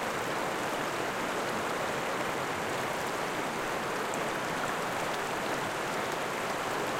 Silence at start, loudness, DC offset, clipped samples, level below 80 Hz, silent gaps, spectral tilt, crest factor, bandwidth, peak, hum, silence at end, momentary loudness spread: 0 s; -32 LUFS; under 0.1%; under 0.1%; -62 dBFS; none; -3 dB/octave; 16 dB; 17 kHz; -18 dBFS; none; 0 s; 1 LU